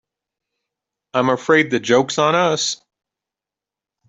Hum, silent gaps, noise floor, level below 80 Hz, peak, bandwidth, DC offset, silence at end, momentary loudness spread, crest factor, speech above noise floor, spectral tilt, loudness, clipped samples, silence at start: none; none; -88 dBFS; -64 dBFS; -2 dBFS; 8.2 kHz; under 0.1%; 1.35 s; 7 LU; 18 dB; 71 dB; -3.5 dB/octave; -17 LUFS; under 0.1%; 1.15 s